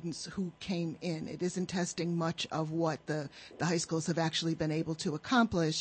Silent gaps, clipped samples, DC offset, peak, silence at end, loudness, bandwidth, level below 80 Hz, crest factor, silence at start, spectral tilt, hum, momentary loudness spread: none; under 0.1%; under 0.1%; -14 dBFS; 0 s; -34 LUFS; 8.8 kHz; -64 dBFS; 18 dB; 0 s; -5 dB/octave; none; 8 LU